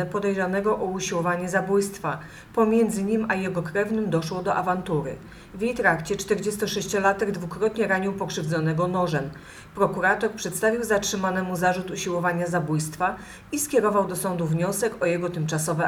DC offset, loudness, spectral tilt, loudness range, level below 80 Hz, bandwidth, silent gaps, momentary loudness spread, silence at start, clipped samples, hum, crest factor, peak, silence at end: under 0.1%; -25 LUFS; -5 dB/octave; 1 LU; -54 dBFS; 19.5 kHz; none; 6 LU; 0 s; under 0.1%; none; 18 dB; -6 dBFS; 0 s